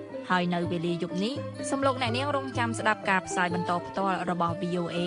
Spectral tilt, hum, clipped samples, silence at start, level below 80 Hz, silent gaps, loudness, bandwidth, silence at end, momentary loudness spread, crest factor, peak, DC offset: -5 dB/octave; none; under 0.1%; 0 s; -62 dBFS; none; -28 LUFS; 11 kHz; 0 s; 4 LU; 20 dB; -10 dBFS; under 0.1%